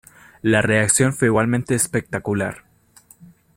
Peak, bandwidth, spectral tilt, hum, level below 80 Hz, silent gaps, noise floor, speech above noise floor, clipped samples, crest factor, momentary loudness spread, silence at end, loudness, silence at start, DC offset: 0 dBFS; 16.5 kHz; -4.5 dB/octave; none; -52 dBFS; none; -52 dBFS; 33 dB; under 0.1%; 20 dB; 9 LU; 0.3 s; -19 LUFS; 0.45 s; under 0.1%